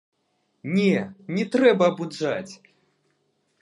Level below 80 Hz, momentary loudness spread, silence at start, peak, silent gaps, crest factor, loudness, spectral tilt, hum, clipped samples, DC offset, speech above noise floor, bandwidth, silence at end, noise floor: -74 dBFS; 13 LU; 0.65 s; -4 dBFS; none; 20 dB; -23 LUFS; -6.5 dB/octave; none; under 0.1%; under 0.1%; 49 dB; 11 kHz; 1.05 s; -71 dBFS